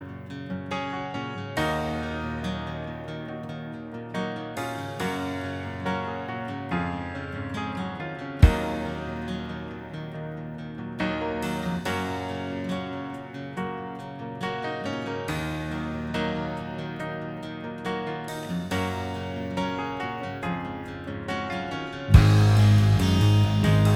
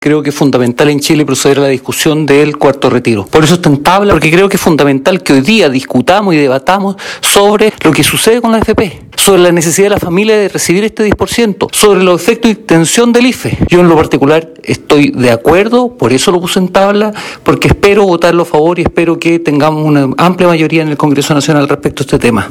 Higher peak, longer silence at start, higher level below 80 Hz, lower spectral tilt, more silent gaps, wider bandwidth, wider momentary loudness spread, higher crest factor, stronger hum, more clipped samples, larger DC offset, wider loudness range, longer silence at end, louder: about the same, -2 dBFS vs 0 dBFS; about the same, 0 s vs 0 s; about the same, -36 dBFS vs -32 dBFS; first, -6.5 dB/octave vs -4.5 dB/octave; neither; second, 14 kHz vs over 20 kHz; first, 15 LU vs 5 LU; first, 26 dB vs 8 dB; neither; second, under 0.1% vs 5%; neither; first, 9 LU vs 1 LU; about the same, 0 s vs 0 s; second, -28 LUFS vs -8 LUFS